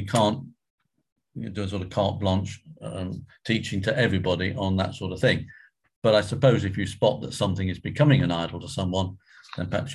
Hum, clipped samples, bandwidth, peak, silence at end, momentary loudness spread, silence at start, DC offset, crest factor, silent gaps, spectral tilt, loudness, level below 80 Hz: none; under 0.1%; 12.5 kHz; -6 dBFS; 0 s; 14 LU; 0 s; under 0.1%; 20 dB; 0.70-0.78 s, 1.12-1.16 s, 5.96-6.02 s; -6 dB/octave; -25 LUFS; -44 dBFS